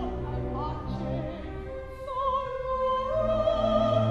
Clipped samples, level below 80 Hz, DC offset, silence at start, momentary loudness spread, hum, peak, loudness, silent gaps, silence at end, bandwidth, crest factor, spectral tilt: under 0.1%; -40 dBFS; under 0.1%; 0 s; 13 LU; none; -12 dBFS; -29 LUFS; none; 0 s; 7.8 kHz; 16 dB; -8 dB/octave